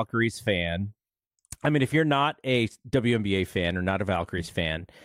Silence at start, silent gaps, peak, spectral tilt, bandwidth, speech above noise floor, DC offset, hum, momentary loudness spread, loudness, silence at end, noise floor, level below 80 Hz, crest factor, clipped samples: 0 s; 1.27-1.31 s; -12 dBFS; -6 dB/octave; 16 kHz; 48 dB; under 0.1%; none; 7 LU; -26 LUFS; 0.2 s; -74 dBFS; -50 dBFS; 14 dB; under 0.1%